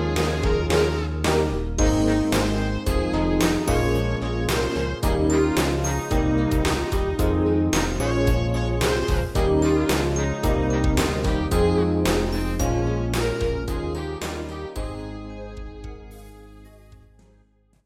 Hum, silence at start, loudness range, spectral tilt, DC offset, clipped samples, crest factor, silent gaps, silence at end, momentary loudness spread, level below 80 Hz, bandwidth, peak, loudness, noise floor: none; 0 s; 9 LU; -5.5 dB/octave; under 0.1%; under 0.1%; 16 dB; none; 0.9 s; 11 LU; -28 dBFS; 16.5 kHz; -6 dBFS; -23 LUFS; -59 dBFS